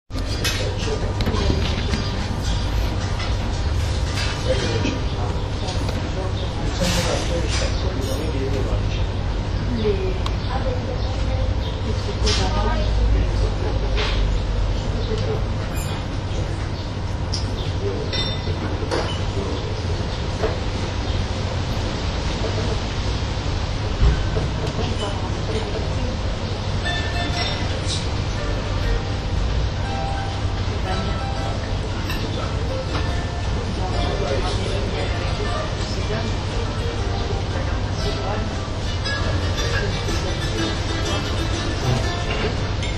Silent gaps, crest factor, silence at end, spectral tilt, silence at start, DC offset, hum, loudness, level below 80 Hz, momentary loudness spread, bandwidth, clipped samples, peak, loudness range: none; 18 dB; 0 s; -5.5 dB/octave; 0.1 s; under 0.1%; none; -24 LUFS; -26 dBFS; 4 LU; 13 kHz; under 0.1%; -4 dBFS; 2 LU